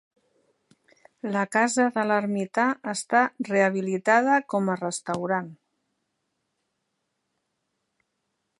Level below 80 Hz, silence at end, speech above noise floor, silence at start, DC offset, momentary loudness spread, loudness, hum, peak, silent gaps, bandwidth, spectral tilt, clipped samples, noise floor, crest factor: -78 dBFS; 3.05 s; 54 dB; 1.25 s; under 0.1%; 8 LU; -24 LUFS; none; -6 dBFS; none; 11.5 kHz; -5 dB/octave; under 0.1%; -78 dBFS; 20 dB